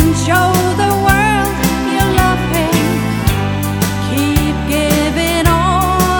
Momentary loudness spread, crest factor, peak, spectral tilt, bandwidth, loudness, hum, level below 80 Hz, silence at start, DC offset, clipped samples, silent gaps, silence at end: 4 LU; 12 dB; 0 dBFS; -5 dB/octave; over 20 kHz; -13 LUFS; none; -24 dBFS; 0 s; under 0.1%; under 0.1%; none; 0 s